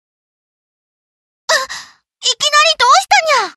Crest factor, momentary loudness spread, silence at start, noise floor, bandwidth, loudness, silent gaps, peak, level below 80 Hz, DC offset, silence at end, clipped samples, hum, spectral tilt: 16 dB; 17 LU; 1.5 s; -34 dBFS; 13 kHz; -11 LUFS; none; 0 dBFS; -62 dBFS; under 0.1%; 0.05 s; under 0.1%; none; 2.5 dB/octave